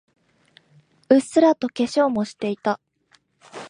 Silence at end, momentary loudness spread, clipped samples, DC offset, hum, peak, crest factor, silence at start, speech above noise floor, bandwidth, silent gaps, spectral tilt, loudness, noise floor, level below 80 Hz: 0 s; 9 LU; under 0.1%; under 0.1%; none; -2 dBFS; 20 dB; 1.1 s; 42 dB; 11 kHz; none; -5.5 dB/octave; -21 LUFS; -62 dBFS; -70 dBFS